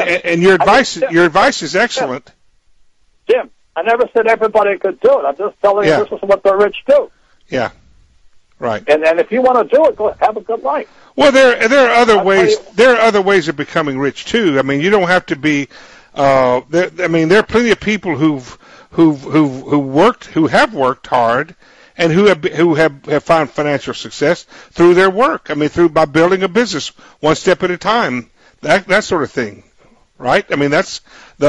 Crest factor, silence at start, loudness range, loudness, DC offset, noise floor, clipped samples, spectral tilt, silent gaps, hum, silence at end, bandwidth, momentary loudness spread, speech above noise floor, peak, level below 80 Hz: 14 dB; 0 s; 5 LU; -13 LUFS; under 0.1%; -50 dBFS; under 0.1%; -5 dB/octave; none; none; 0 s; 11 kHz; 10 LU; 37 dB; 0 dBFS; -46 dBFS